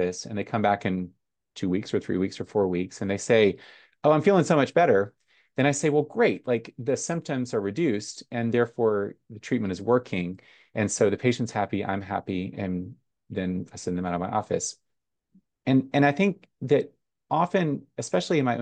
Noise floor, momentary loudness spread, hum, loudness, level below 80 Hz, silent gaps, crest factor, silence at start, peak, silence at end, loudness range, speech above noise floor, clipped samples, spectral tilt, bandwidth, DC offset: -83 dBFS; 12 LU; none; -26 LUFS; -66 dBFS; none; 18 dB; 0 s; -6 dBFS; 0 s; 6 LU; 58 dB; under 0.1%; -5.5 dB/octave; 10 kHz; under 0.1%